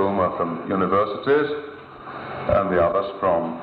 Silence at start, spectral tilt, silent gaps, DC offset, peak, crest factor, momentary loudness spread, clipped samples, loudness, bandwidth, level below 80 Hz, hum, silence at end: 0 s; -9.5 dB/octave; none; under 0.1%; -8 dBFS; 14 dB; 15 LU; under 0.1%; -22 LUFS; 5 kHz; -48 dBFS; none; 0 s